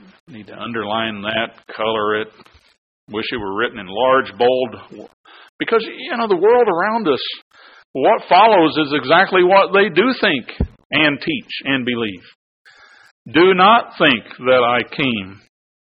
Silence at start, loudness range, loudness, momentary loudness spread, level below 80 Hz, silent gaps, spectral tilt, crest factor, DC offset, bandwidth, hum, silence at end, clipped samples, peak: 0.3 s; 7 LU; -16 LUFS; 14 LU; -42 dBFS; 2.78-3.07 s, 5.13-5.24 s, 5.49-5.59 s, 7.42-7.51 s, 7.85-7.94 s, 10.85-10.90 s, 12.35-12.65 s, 13.11-13.25 s; -8 dB/octave; 18 dB; under 0.1%; 5.4 kHz; none; 0.45 s; under 0.1%; 0 dBFS